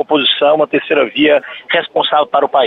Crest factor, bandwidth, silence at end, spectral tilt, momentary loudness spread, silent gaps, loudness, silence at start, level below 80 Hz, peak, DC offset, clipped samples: 12 dB; 4.3 kHz; 0 s; -6.5 dB/octave; 5 LU; none; -13 LUFS; 0 s; -60 dBFS; -2 dBFS; under 0.1%; under 0.1%